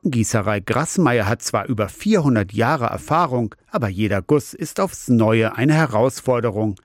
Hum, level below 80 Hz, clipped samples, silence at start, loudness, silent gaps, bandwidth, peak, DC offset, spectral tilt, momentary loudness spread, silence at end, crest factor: none; -52 dBFS; under 0.1%; 0.05 s; -19 LUFS; none; 16.5 kHz; -6 dBFS; under 0.1%; -6 dB/octave; 7 LU; 0.1 s; 14 dB